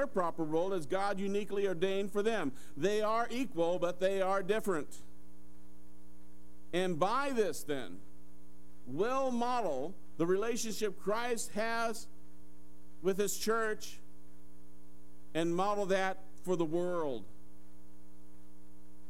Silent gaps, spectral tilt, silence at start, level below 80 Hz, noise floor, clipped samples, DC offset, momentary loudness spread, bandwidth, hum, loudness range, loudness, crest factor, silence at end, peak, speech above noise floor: none; -4.5 dB/octave; 0 s; -66 dBFS; -60 dBFS; under 0.1%; 1%; 10 LU; 16 kHz; none; 4 LU; -35 LUFS; 20 dB; 1.8 s; -16 dBFS; 26 dB